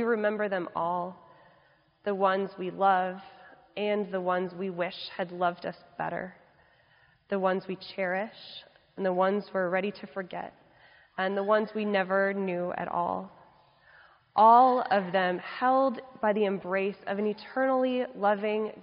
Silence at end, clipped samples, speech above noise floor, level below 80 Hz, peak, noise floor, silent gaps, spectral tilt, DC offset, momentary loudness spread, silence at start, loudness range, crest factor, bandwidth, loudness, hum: 0 s; under 0.1%; 36 dB; -74 dBFS; -8 dBFS; -64 dBFS; none; -4 dB/octave; under 0.1%; 14 LU; 0 s; 8 LU; 20 dB; 5.4 kHz; -28 LUFS; none